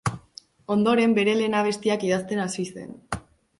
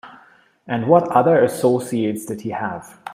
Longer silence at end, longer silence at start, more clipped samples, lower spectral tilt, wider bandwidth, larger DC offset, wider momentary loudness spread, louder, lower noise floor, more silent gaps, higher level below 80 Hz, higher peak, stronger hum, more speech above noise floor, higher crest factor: first, 0.4 s vs 0 s; about the same, 0.05 s vs 0.05 s; neither; second, -5 dB/octave vs -6.5 dB/octave; second, 11.5 kHz vs 15.5 kHz; neither; first, 16 LU vs 13 LU; second, -24 LUFS vs -19 LUFS; about the same, -49 dBFS vs -52 dBFS; neither; first, -54 dBFS vs -64 dBFS; second, -8 dBFS vs 0 dBFS; neither; second, 26 dB vs 34 dB; about the same, 16 dB vs 18 dB